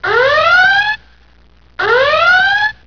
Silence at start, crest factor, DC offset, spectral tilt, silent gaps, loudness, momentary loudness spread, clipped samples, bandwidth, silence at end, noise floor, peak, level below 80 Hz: 0 s; 12 dB; 0.6%; -2.5 dB/octave; none; -10 LUFS; 9 LU; under 0.1%; 5.4 kHz; 0.15 s; -47 dBFS; 0 dBFS; -46 dBFS